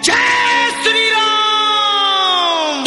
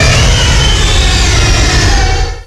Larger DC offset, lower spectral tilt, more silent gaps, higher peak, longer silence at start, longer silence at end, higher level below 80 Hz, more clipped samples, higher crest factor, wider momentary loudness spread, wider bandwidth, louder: neither; second, 0 dB/octave vs -3.5 dB/octave; neither; about the same, 0 dBFS vs 0 dBFS; about the same, 0 s vs 0 s; about the same, 0 s vs 0 s; second, -54 dBFS vs -12 dBFS; neither; first, 14 dB vs 8 dB; about the same, 2 LU vs 2 LU; about the same, 11.5 kHz vs 12 kHz; second, -12 LUFS vs -9 LUFS